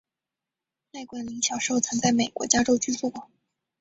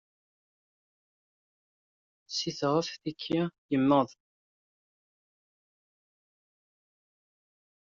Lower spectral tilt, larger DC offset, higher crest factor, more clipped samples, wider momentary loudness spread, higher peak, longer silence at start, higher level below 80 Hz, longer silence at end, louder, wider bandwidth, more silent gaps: second, -2.5 dB/octave vs -5 dB/octave; neither; about the same, 24 dB vs 24 dB; neither; first, 19 LU vs 11 LU; first, -4 dBFS vs -12 dBFS; second, 0.95 s vs 2.3 s; first, -58 dBFS vs -74 dBFS; second, 0.55 s vs 3.8 s; first, -24 LUFS vs -30 LUFS; first, 8.2 kHz vs 7.4 kHz; second, none vs 3.58-3.69 s